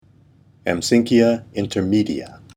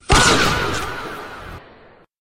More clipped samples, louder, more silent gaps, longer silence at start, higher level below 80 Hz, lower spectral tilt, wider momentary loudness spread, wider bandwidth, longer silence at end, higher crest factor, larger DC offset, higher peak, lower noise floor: neither; about the same, -19 LUFS vs -17 LUFS; neither; first, 0.65 s vs 0.1 s; second, -52 dBFS vs -30 dBFS; first, -5.5 dB/octave vs -3 dB/octave; second, 10 LU vs 22 LU; about the same, 15 kHz vs 16 kHz; second, 0.2 s vs 0.6 s; about the same, 18 dB vs 18 dB; neither; about the same, -2 dBFS vs -2 dBFS; first, -52 dBFS vs -48 dBFS